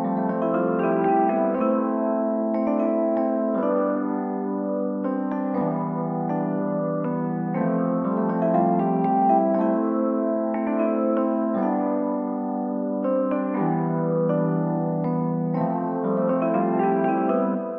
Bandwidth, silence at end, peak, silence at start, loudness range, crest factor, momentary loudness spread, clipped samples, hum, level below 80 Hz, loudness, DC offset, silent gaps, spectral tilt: 3.4 kHz; 0 s; -8 dBFS; 0 s; 3 LU; 16 dB; 5 LU; under 0.1%; none; -72 dBFS; -23 LUFS; under 0.1%; none; -12 dB/octave